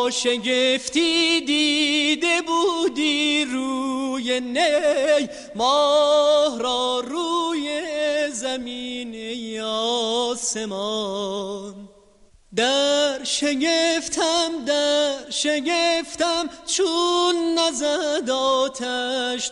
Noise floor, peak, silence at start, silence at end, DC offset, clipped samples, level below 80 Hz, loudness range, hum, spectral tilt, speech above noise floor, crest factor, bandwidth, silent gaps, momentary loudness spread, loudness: -53 dBFS; -6 dBFS; 0 s; 0 s; under 0.1%; under 0.1%; -60 dBFS; 5 LU; none; -1.5 dB/octave; 32 dB; 16 dB; 11.5 kHz; none; 8 LU; -21 LUFS